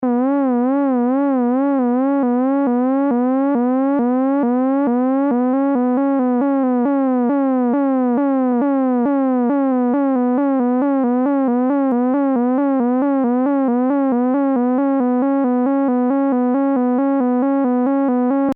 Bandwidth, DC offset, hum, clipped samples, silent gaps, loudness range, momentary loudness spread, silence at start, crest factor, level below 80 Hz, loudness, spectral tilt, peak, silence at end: 3.2 kHz; under 0.1%; none; under 0.1%; none; 0 LU; 0 LU; 0 s; 6 dB; -68 dBFS; -17 LUFS; -10 dB/octave; -10 dBFS; 0 s